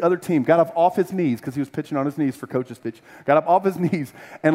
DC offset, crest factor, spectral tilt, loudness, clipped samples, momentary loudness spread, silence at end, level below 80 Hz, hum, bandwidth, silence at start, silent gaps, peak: under 0.1%; 18 dB; -7.5 dB/octave; -21 LUFS; under 0.1%; 13 LU; 0 s; -68 dBFS; none; 16 kHz; 0 s; none; -4 dBFS